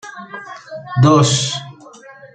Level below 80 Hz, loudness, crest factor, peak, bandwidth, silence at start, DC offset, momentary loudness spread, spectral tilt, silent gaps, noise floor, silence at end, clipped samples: -52 dBFS; -14 LUFS; 16 dB; -2 dBFS; 9.4 kHz; 0.05 s; under 0.1%; 21 LU; -5 dB/octave; none; -40 dBFS; 0.1 s; under 0.1%